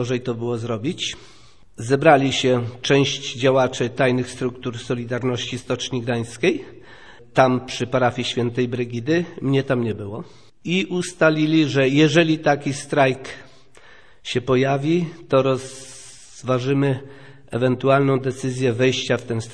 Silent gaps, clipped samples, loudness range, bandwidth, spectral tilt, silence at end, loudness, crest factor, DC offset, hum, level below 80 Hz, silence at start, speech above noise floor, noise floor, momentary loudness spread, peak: none; under 0.1%; 4 LU; 11 kHz; -5.5 dB/octave; 0 s; -21 LUFS; 20 dB; 0.4%; none; -56 dBFS; 0 s; 29 dB; -50 dBFS; 14 LU; -2 dBFS